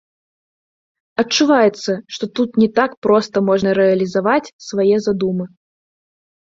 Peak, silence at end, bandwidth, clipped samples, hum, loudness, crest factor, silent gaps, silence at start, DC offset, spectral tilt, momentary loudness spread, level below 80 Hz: 0 dBFS; 1.05 s; 7.8 kHz; under 0.1%; none; -17 LUFS; 16 dB; 2.97-3.02 s, 4.53-4.59 s; 1.2 s; under 0.1%; -5 dB/octave; 10 LU; -58 dBFS